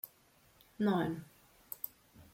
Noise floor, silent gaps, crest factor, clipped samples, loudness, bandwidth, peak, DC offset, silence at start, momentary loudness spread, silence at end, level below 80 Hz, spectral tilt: -67 dBFS; none; 22 dB; under 0.1%; -38 LUFS; 16.5 kHz; -18 dBFS; under 0.1%; 0.05 s; 17 LU; 0.1 s; -72 dBFS; -7 dB/octave